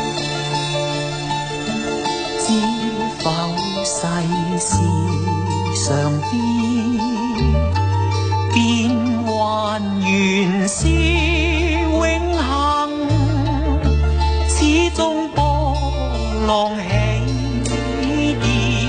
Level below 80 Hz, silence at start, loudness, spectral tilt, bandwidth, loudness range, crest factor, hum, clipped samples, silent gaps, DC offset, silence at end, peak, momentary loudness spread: -26 dBFS; 0 s; -18 LUFS; -5 dB/octave; 9.6 kHz; 3 LU; 14 dB; none; under 0.1%; none; under 0.1%; 0 s; -2 dBFS; 5 LU